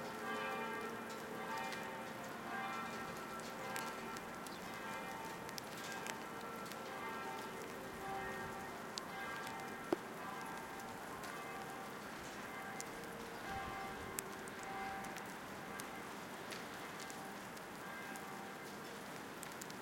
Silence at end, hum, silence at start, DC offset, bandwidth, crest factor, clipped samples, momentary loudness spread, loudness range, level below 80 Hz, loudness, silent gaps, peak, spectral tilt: 0 s; none; 0 s; under 0.1%; 17 kHz; 30 dB; under 0.1%; 5 LU; 3 LU; -72 dBFS; -46 LUFS; none; -18 dBFS; -3.5 dB/octave